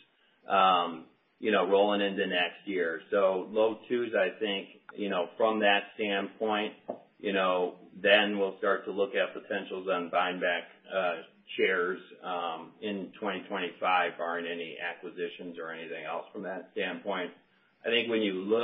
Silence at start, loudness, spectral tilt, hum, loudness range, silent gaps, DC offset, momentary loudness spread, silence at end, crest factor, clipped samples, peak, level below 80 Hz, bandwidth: 0.5 s; -30 LUFS; -8 dB/octave; none; 5 LU; none; under 0.1%; 13 LU; 0 s; 22 dB; under 0.1%; -8 dBFS; -80 dBFS; 4.4 kHz